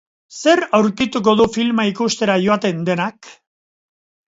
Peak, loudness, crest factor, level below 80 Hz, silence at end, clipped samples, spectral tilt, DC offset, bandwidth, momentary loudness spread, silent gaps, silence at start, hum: 0 dBFS; -17 LUFS; 18 dB; -54 dBFS; 1 s; under 0.1%; -5 dB/octave; under 0.1%; 8 kHz; 6 LU; none; 0.3 s; none